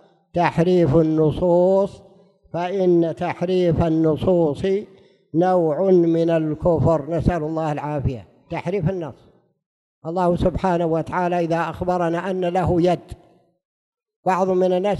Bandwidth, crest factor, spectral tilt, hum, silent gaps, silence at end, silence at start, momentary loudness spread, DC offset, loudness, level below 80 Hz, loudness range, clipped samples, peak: 11 kHz; 16 dB; -8.5 dB/octave; none; 9.66-10.02 s, 13.65-13.92 s, 14.16-14.23 s; 0 s; 0.35 s; 10 LU; under 0.1%; -20 LUFS; -42 dBFS; 5 LU; under 0.1%; -4 dBFS